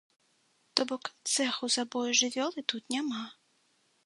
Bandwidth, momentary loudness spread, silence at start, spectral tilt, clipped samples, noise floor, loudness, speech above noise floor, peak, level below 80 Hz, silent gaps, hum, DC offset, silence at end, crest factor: 11.5 kHz; 9 LU; 0.75 s; -0.5 dB/octave; under 0.1%; -71 dBFS; -30 LUFS; 39 dB; -4 dBFS; -86 dBFS; none; none; under 0.1%; 0.75 s; 30 dB